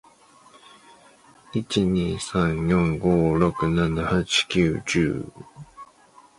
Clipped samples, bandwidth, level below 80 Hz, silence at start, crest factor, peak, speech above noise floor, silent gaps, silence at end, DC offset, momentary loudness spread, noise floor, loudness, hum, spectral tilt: under 0.1%; 11.5 kHz; -42 dBFS; 1.55 s; 18 dB; -6 dBFS; 31 dB; none; 0.55 s; under 0.1%; 16 LU; -53 dBFS; -23 LUFS; none; -5.5 dB/octave